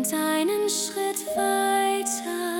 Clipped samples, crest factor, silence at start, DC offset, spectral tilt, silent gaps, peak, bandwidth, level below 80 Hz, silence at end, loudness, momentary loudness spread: under 0.1%; 14 dB; 0 s; under 0.1%; -1.5 dB/octave; none; -10 dBFS; 18 kHz; -70 dBFS; 0 s; -24 LUFS; 5 LU